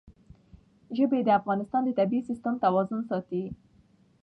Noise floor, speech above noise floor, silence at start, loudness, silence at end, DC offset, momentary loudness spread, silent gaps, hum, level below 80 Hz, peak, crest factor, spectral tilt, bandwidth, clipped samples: -62 dBFS; 35 dB; 0.05 s; -27 LUFS; 0.7 s; under 0.1%; 10 LU; none; none; -62 dBFS; -12 dBFS; 18 dB; -9 dB/octave; 8 kHz; under 0.1%